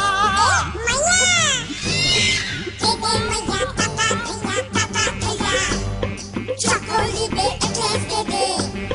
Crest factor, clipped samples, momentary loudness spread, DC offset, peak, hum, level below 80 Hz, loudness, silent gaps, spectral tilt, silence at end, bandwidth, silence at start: 16 dB; under 0.1%; 8 LU; under 0.1%; -6 dBFS; none; -36 dBFS; -19 LUFS; none; -2.5 dB/octave; 0 s; 11 kHz; 0 s